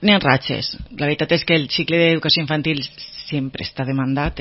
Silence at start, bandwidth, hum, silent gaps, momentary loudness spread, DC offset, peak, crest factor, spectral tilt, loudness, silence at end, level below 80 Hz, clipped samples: 0 s; 6 kHz; none; none; 11 LU; under 0.1%; 0 dBFS; 20 dB; -8 dB/octave; -19 LUFS; 0 s; -42 dBFS; under 0.1%